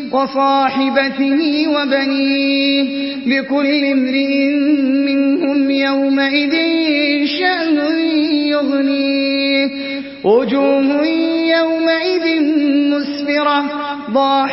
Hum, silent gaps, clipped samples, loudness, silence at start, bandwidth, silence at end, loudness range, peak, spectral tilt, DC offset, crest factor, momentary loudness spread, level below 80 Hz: none; none; under 0.1%; -15 LUFS; 0 s; 5.8 kHz; 0 s; 1 LU; -2 dBFS; -8 dB/octave; under 0.1%; 14 dB; 3 LU; -62 dBFS